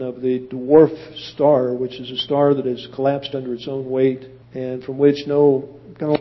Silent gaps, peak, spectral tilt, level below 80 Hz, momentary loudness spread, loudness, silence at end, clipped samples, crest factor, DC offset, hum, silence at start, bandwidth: none; -2 dBFS; -8 dB/octave; -58 dBFS; 13 LU; -19 LUFS; 0 s; under 0.1%; 18 dB; under 0.1%; none; 0 s; 6 kHz